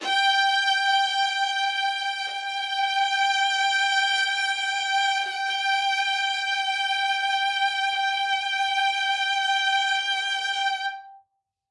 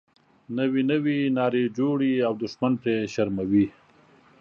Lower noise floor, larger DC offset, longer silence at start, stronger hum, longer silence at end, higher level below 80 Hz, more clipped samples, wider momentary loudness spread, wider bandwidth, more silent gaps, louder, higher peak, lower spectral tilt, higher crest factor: first, -69 dBFS vs -56 dBFS; neither; second, 0 s vs 0.5 s; neither; second, 0.5 s vs 0.7 s; second, -88 dBFS vs -60 dBFS; neither; about the same, 5 LU vs 4 LU; first, 11.5 kHz vs 7.2 kHz; neither; about the same, -23 LUFS vs -25 LUFS; about the same, -12 dBFS vs -10 dBFS; second, 4.5 dB/octave vs -7.5 dB/octave; about the same, 14 dB vs 16 dB